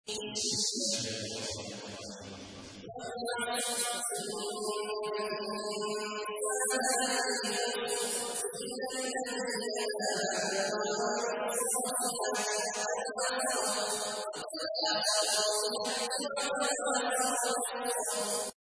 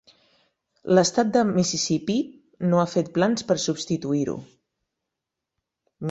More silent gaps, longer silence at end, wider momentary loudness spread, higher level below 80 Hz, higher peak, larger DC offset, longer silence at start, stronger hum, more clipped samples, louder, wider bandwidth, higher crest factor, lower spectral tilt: neither; first, 0.15 s vs 0 s; second, 8 LU vs 11 LU; second, -74 dBFS vs -62 dBFS; second, -18 dBFS vs -6 dBFS; neither; second, 0.05 s vs 0.85 s; neither; neither; second, -32 LUFS vs -23 LUFS; first, 11 kHz vs 8.2 kHz; about the same, 16 dB vs 20 dB; second, -1 dB/octave vs -5 dB/octave